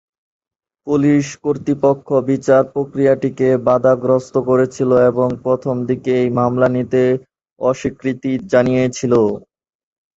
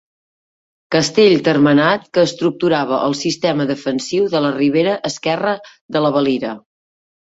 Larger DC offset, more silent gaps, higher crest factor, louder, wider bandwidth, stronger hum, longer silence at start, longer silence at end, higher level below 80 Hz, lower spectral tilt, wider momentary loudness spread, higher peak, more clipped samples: neither; about the same, 7.52-7.56 s vs 5.81-5.89 s; about the same, 16 dB vs 16 dB; about the same, -16 LUFS vs -16 LUFS; about the same, 8 kHz vs 8 kHz; neither; about the same, 0.85 s vs 0.9 s; about the same, 0.8 s vs 0.7 s; first, -52 dBFS vs -58 dBFS; first, -7.5 dB/octave vs -5 dB/octave; about the same, 7 LU vs 9 LU; about the same, 0 dBFS vs 0 dBFS; neither